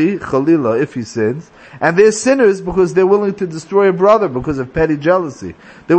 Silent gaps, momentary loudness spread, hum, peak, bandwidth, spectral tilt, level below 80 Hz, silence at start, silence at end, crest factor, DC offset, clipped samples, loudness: none; 9 LU; none; 0 dBFS; 8.8 kHz; -6 dB/octave; -42 dBFS; 0 s; 0 s; 14 dB; under 0.1%; under 0.1%; -14 LUFS